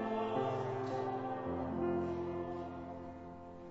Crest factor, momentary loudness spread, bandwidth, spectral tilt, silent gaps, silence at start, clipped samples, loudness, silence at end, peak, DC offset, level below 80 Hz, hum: 16 dB; 12 LU; 7.6 kHz; -6.5 dB/octave; none; 0 s; under 0.1%; -39 LUFS; 0 s; -24 dBFS; under 0.1%; -64 dBFS; none